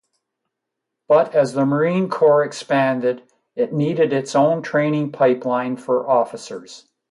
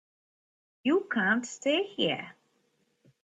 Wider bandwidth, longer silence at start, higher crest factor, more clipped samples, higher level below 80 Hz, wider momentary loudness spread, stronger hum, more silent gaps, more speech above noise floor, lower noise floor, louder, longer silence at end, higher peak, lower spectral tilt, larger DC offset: first, 11.5 kHz vs 8.4 kHz; first, 1.1 s vs 0.85 s; about the same, 16 dB vs 18 dB; neither; first, -70 dBFS vs -78 dBFS; about the same, 10 LU vs 8 LU; neither; neither; first, 62 dB vs 44 dB; first, -81 dBFS vs -73 dBFS; first, -19 LUFS vs -29 LUFS; second, 0.35 s vs 0.95 s; first, -4 dBFS vs -14 dBFS; first, -6.5 dB/octave vs -4 dB/octave; neither